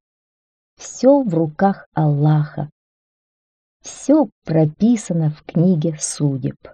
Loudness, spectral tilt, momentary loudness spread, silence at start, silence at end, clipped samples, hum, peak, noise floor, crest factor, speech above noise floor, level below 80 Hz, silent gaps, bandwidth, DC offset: -18 LUFS; -7 dB/octave; 15 LU; 0.8 s; 0.2 s; under 0.1%; none; -2 dBFS; under -90 dBFS; 16 dB; over 73 dB; -58 dBFS; 1.86-1.92 s, 2.72-3.80 s, 4.32-4.42 s; 9.4 kHz; under 0.1%